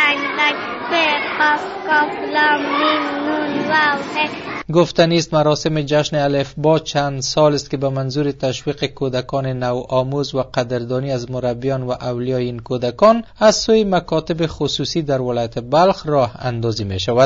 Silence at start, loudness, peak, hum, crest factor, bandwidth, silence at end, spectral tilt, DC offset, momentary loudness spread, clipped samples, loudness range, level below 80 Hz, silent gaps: 0 s; -18 LUFS; 0 dBFS; none; 16 dB; 8 kHz; 0 s; -5 dB/octave; under 0.1%; 7 LU; under 0.1%; 4 LU; -46 dBFS; none